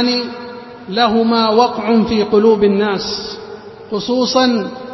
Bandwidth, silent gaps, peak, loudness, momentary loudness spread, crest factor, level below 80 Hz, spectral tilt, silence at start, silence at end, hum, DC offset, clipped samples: 6.2 kHz; none; 0 dBFS; -14 LUFS; 18 LU; 14 dB; -48 dBFS; -5 dB/octave; 0 s; 0 s; none; under 0.1%; under 0.1%